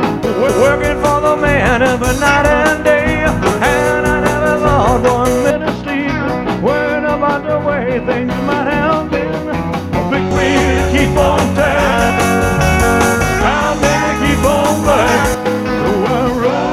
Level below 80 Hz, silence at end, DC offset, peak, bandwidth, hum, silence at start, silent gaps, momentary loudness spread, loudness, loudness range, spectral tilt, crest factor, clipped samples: -26 dBFS; 0 s; under 0.1%; 0 dBFS; 16.5 kHz; none; 0 s; none; 5 LU; -13 LUFS; 3 LU; -5 dB/octave; 12 dB; under 0.1%